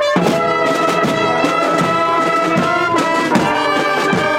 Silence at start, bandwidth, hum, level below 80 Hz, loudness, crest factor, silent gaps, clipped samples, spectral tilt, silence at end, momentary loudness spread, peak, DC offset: 0 s; 17 kHz; none; -50 dBFS; -14 LUFS; 12 dB; none; under 0.1%; -5 dB/octave; 0 s; 1 LU; -2 dBFS; under 0.1%